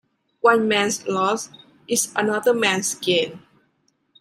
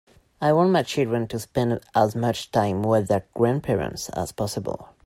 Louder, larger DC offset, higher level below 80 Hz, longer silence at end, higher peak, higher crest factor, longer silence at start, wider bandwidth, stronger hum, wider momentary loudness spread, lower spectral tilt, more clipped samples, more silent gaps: first, -20 LUFS vs -24 LUFS; neither; second, -70 dBFS vs -52 dBFS; first, 0.8 s vs 0.2 s; first, -2 dBFS vs -6 dBFS; about the same, 20 dB vs 18 dB; about the same, 0.45 s vs 0.4 s; about the same, 15.5 kHz vs 16 kHz; neither; second, 6 LU vs 9 LU; second, -2.5 dB/octave vs -6 dB/octave; neither; neither